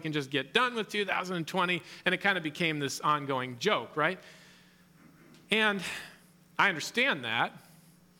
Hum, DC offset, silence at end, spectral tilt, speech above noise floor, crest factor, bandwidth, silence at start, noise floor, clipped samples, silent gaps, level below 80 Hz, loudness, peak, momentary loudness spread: none; under 0.1%; 0.6 s; -3.5 dB/octave; 29 dB; 22 dB; 18 kHz; 0 s; -59 dBFS; under 0.1%; none; -76 dBFS; -30 LUFS; -10 dBFS; 7 LU